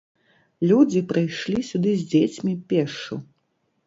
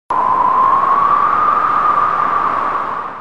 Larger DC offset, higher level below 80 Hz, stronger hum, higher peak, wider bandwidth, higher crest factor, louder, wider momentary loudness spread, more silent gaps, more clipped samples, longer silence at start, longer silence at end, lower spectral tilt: second, under 0.1% vs 2%; second, -62 dBFS vs -46 dBFS; neither; about the same, -6 dBFS vs -4 dBFS; second, 7.8 kHz vs 9 kHz; first, 18 dB vs 10 dB; second, -22 LUFS vs -13 LUFS; first, 11 LU vs 6 LU; neither; neither; first, 0.6 s vs 0.1 s; first, 0.65 s vs 0 s; first, -7 dB/octave vs -5.5 dB/octave